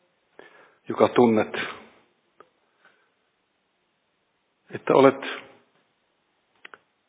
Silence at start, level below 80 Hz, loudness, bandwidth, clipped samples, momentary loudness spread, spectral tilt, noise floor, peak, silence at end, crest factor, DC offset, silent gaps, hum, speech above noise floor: 0.9 s; -70 dBFS; -22 LUFS; 4 kHz; under 0.1%; 20 LU; -10 dB/octave; -72 dBFS; -2 dBFS; 1.7 s; 24 dB; under 0.1%; none; none; 52 dB